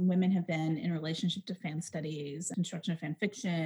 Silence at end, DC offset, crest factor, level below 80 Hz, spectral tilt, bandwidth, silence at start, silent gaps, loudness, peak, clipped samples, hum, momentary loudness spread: 0 s; under 0.1%; 14 dB; -82 dBFS; -5.5 dB/octave; 12 kHz; 0 s; none; -34 LUFS; -18 dBFS; under 0.1%; none; 8 LU